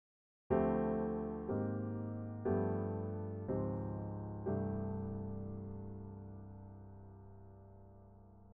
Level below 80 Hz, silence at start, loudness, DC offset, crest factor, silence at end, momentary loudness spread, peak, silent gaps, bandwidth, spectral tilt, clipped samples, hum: -58 dBFS; 0.5 s; -40 LUFS; under 0.1%; 20 dB; 0.05 s; 21 LU; -22 dBFS; none; 3.4 kHz; -11 dB/octave; under 0.1%; none